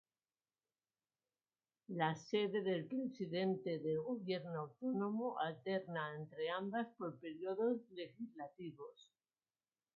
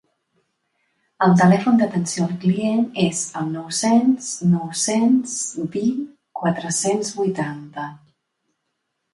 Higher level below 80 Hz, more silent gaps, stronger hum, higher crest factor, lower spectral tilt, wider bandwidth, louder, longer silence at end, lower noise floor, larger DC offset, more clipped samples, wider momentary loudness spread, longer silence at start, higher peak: second, -90 dBFS vs -64 dBFS; neither; neither; about the same, 20 dB vs 18 dB; about the same, -5 dB/octave vs -5 dB/octave; second, 6.4 kHz vs 11.5 kHz; second, -42 LUFS vs -20 LUFS; about the same, 1.05 s vs 1.15 s; first, under -90 dBFS vs -75 dBFS; neither; neither; about the same, 12 LU vs 12 LU; first, 1.9 s vs 1.2 s; second, -22 dBFS vs -2 dBFS